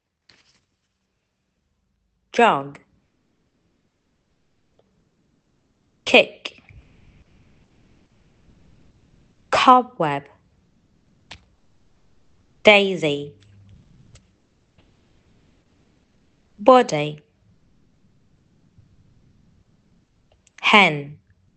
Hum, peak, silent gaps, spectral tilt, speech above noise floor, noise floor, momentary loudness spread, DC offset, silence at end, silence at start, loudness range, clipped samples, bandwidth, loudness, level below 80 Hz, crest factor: none; 0 dBFS; none; -4 dB/octave; 57 dB; -73 dBFS; 22 LU; under 0.1%; 0.45 s; 2.35 s; 4 LU; under 0.1%; 8.8 kHz; -17 LUFS; -62 dBFS; 24 dB